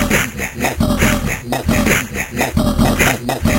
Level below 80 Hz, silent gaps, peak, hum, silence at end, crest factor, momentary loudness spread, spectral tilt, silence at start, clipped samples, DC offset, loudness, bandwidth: -26 dBFS; none; 0 dBFS; none; 0 s; 16 dB; 6 LU; -4.5 dB/octave; 0 s; under 0.1%; under 0.1%; -16 LUFS; 16.5 kHz